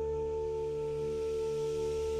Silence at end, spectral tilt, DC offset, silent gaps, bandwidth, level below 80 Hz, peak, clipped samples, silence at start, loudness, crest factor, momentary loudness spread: 0 s; -6 dB/octave; under 0.1%; none; 12 kHz; -50 dBFS; -26 dBFS; under 0.1%; 0 s; -35 LUFS; 8 dB; 1 LU